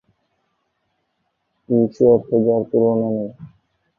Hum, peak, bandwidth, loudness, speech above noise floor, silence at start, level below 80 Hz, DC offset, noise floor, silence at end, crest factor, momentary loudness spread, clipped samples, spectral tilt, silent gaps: none; -2 dBFS; 6 kHz; -18 LUFS; 55 dB; 1.7 s; -58 dBFS; under 0.1%; -71 dBFS; 0.55 s; 18 dB; 9 LU; under 0.1%; -11.5 dB/octave; none